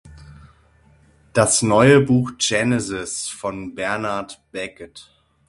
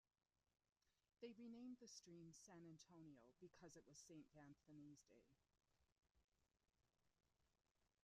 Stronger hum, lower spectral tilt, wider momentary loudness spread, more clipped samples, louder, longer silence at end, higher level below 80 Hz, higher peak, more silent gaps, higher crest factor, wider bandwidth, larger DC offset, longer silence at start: neither; about the same, -4.5 dB/octave vs -4.5 dB/octave; first, 18 LU vs 8 LU; neither; first, -19 LUFS vs -64 LUFS; first, 0.45 s vs 0.2 s; first, -50 dBFS vs under -90 dBFS; first, 0 dBFS vs -46 dBFS; second, none vs 6.11-6.15 s, 6.24-6.28 s, 7.71-7.75 s; about the same, 20 dB vs 22 dB; first, 11.5 kHz vs 10 kHz; neither; second, 0.05 s vs 0.85 s